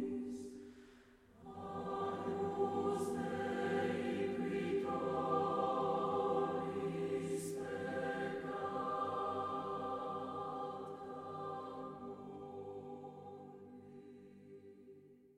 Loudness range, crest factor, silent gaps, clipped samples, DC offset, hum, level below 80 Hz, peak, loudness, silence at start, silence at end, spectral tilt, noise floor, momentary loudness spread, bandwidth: 12 LU; 16 dB; none; under 0.1%; under 0.1%; none; -74 dBFS; -24 dBFS; -40 LUFS; 0 s; 0.05 s; -6 dB/octave; -63 dBFS; 20 LU; 14.5 kHz